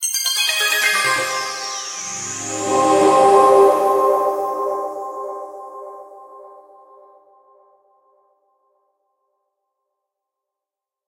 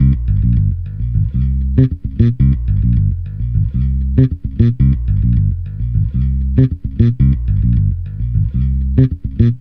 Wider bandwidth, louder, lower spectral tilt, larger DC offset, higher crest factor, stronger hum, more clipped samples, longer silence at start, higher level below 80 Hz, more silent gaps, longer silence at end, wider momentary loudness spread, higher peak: first, 16 kHz vs 4.1 kHz; about the same, -16 LUFS vs -16 LUFS; second, -1.5 dB/octave vs -12 dB/octave; neither; first, 20 dB vs 14 dB; neither; neither; about the same, 0 s vs 0 s; second, -70 dBFS vs -18 dBFS; neither; first, 4.5 s vs 0 s; first, 20 LU vs 6 LU; about the same, 0 dBFS vs 0 dBFS